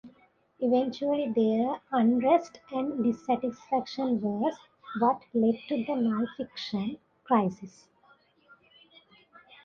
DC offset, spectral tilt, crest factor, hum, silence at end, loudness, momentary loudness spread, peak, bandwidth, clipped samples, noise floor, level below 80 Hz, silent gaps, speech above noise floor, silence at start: under 0.1%; -7 dB/octave; 18 dB; none; 1.95 s; -28 LUFS; 10 LU; -10 dBFS; 7 kHz; under 0.1%; -63 dBFS; -70 dBFS; none; 35 dB; 0.05 s